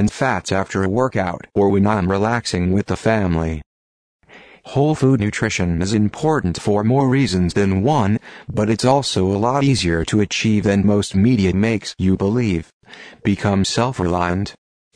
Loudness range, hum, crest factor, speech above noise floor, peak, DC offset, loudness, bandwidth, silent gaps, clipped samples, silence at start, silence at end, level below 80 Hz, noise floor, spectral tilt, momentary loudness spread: 3 LU; none; 16 dB; over 73 dB; -2 dBFS; under 0.1%; -18 LUFS; 10.5 kHz; 3.66-4.20 s, 12.73-12.80 s; under 0.1%; 0 s; 0.45 s; -40 dBFS; under -90 dBFS; -6 dB/octave; 6 LU